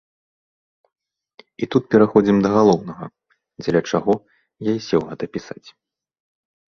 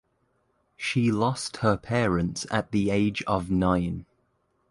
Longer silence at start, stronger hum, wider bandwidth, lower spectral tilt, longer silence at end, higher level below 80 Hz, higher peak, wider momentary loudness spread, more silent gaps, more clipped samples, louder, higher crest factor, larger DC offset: first, 1.6 s vs 0.8 s; neither; second, 7 kHz vs 11.5 kHz; about the same, -7 dB/octave vs -6 dB/octave; first, 1.25 s vs 0.7 s; second, -56 dBFS vs -46 dBFS; first, -2 dBFS vs -8 dBFS; first, 19 LU vs 5 LU; neither; neither; first, -19 LUFS vs -26 LUFS; about the same, 20 dB vs 18 dB; neither